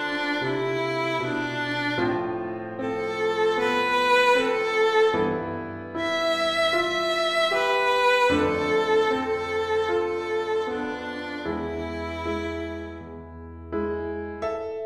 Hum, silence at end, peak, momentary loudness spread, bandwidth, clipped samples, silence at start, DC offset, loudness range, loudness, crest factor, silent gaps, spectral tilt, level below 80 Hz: none; 0 s; -10 dBFS; 12 LU; 14 kHz; under 0.1%; 0 s; under 0.1%; 9 LU; -24 LUFS; 16 dB; none; -4.5 dB/octave; -50 dBFS